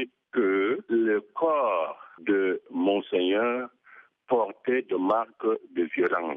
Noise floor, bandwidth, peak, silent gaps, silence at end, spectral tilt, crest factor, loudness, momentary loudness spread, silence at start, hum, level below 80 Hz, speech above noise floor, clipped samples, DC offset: -55 dBFS; 3.8 kHz; -12 dBFS; none; 0 s; -2.5 dB/octave; 14 dB; -27 LUFS; 5 LU; 0 s; none; -80 dBFS; 29 dB; under 0.1%; under 0.1%